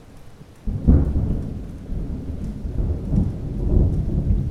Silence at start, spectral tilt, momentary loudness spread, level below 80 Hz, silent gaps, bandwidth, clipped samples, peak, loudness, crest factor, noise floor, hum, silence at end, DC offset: 0 s; -10.5 dB/octave; 13 LU; -24 dBFS; none; 5.8 kHz; under 0.1%; -2 dBFS; -24 LUFS; 20 dB; -42 dBFS; none; 0 s; under 0.1%